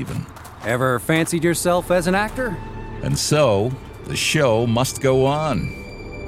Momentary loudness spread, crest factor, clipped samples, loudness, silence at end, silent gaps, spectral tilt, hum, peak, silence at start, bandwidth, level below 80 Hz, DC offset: 14 LU; 16 dB; under 0.1%; -20 LUFS; 0 s; none; -5 dB/octave; none; -4 dBFS; 0 s; 16.5 kHz; -40 dBFS; under 0.1%